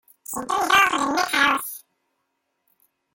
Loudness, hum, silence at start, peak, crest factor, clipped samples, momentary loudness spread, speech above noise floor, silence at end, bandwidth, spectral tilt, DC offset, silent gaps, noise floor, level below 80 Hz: -20 LUFS; none; 0.3 s; -6 dBFS; 18 dB; under 0.1%; 16 LU; 55 dB; 1.35 s; 17 kHz; -1 dB/octave; under 0.1%; none; -75 dBFS; -60 dBFS